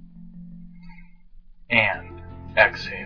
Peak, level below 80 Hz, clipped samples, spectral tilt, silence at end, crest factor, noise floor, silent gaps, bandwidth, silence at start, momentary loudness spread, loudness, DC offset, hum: -2 dBFS; -46 dBFS; under 0.1%; -5.5 dB/octave; 0 s; 26 dB; -47 dBFS; none; 5.4 kHz; 0 s; 24 LU; -20 LUFS; 0.2%; none